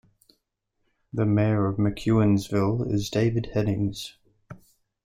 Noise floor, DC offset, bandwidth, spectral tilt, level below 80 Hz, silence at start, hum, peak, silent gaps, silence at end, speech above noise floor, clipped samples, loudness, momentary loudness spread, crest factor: -76 dBFS; under 0.1%; 15 kHz; -7.5 dB/octave; -50 dBFS; 1.15 s; none; -10 dBFS; none; 0.5 s; 53 dB; under 0.1%; -25 LUFS; 8 LU; 16 dB